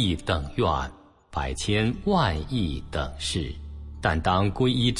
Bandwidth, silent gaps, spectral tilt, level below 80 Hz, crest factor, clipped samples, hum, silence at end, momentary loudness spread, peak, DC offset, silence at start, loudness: 11.5 kHz; none; -5.5 dB/octave; -38 dBFS; 18 dB; under 0.1%; none; 0 s; 11 LU; -8 dBFS; under 0.1%; 0 s; -26 LUFS